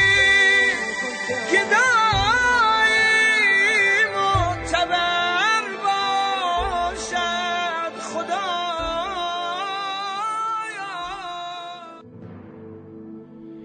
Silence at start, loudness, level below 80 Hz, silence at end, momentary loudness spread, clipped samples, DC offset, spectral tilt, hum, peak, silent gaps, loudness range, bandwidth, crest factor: 0 s; -19 LUFS; -44 dBFS; 0 s; 15 LU; under 0.1%; under 0.1%; -2.5 dB/octave; none; -6 dBFS; none; 12 LU; 9.4 kHz; 16 dB